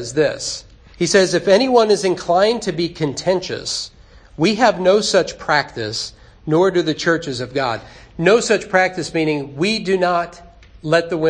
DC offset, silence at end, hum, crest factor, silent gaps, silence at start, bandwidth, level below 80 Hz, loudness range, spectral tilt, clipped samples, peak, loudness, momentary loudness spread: under 0.1%; 0 s; none; 18 dB; none; 0 s; 10.5 kHz; -48 dBFS; 2 LU; -4 dB/octave; under 0.1%; 0 dBFS; -17 LUFS; 11 LU